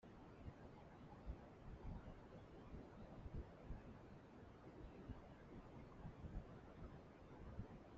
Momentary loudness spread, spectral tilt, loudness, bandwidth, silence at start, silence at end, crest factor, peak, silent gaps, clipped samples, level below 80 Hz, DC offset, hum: 5 LU; -7.5 dB/octave; -59 LUFS; 7.4 kHz; 0 s; 0 s; 20 dB; -38 dBFS; none; under 0.1%; -62 dBFS; under 0.1%; none